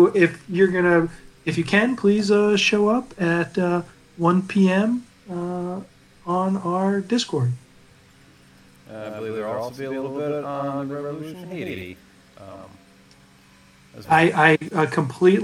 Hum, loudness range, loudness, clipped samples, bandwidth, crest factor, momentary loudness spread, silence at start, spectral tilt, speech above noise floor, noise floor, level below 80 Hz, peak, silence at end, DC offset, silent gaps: none; 11 LU; -21 LUFS; under 0.1%; 12 kHz; 20 dB; 17 LU; 0 s; -6 dB/octave; 31 dB; -52 dBFS; -60 dBFS; -2 dBFS; 0 s; under 0.1%; none